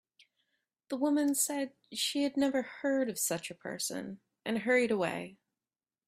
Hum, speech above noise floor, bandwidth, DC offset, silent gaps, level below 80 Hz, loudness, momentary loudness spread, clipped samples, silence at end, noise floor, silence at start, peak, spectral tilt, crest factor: none; over 58 dB; 16 kHz; under 0.1%; none; -76 dBFS; -32 LUFS; 13 LU; under 0.1%; 0.75 s; under -90 dBFS; 0.9 s; -16 dBFS; -3 dB/octave; 18 dB